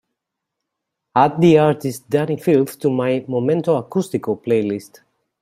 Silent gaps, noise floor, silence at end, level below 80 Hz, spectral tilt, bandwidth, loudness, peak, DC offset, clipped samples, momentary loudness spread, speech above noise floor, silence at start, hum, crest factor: none; -80 dBFS; 0.55 s; -60 dBFS; -7 dB/octave; 16 kHz; -18 LUFS; -2 dBFS; under 0.1%; under 0.1%; 10 LU; 63 dB; 1.15 s; none; 18 dB